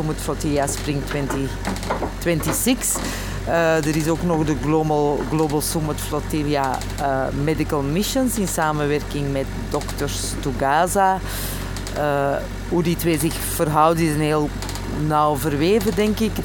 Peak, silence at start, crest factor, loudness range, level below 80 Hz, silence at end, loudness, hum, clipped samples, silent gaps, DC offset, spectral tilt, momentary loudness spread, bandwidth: -2 dBFS; 0 s; 18 dB; 2 LU; -32 dBFS; 0 s; -21 LUFS; none; under 0.1%; none; under 0.1%; -5 dB/octave; 7 LU; 17.5 kHz